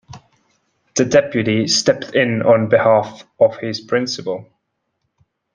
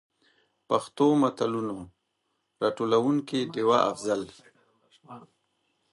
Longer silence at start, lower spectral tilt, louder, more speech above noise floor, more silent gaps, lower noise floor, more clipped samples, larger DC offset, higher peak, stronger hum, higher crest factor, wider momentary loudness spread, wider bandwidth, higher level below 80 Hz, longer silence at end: second, 0.1 s vs 0.7 s; second, -4 dB/octave vs -6 dB/octave; first, -16 LUFS vs -26 LUFS; first, 56 dB vs 52 dB; neither; second, -72 dBFS vs -77 dBFS; neither; neither; first, -2 dBFS vs -8 dBFS; neither; about the same, 16 dB vs 20 dB; first, 12 LU vs 9 LU; second, 10 kHz vs 11.5 kHz; first, -58 dBFS vs -70 dBFS; first, 1.1 s vs 0.7 s